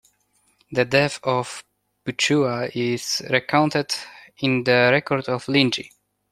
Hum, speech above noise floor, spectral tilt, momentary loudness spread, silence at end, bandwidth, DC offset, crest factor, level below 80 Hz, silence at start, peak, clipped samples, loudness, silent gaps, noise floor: none; 44 dB; -4.5 dB/octave; 13 LU; 0.45 s; 15 kHz; under 0.1%; 22 dB; -62 dBFS; 0.7 s; -2 dBFS; under 0.1%; -21 LUFS; none; -65 dBFS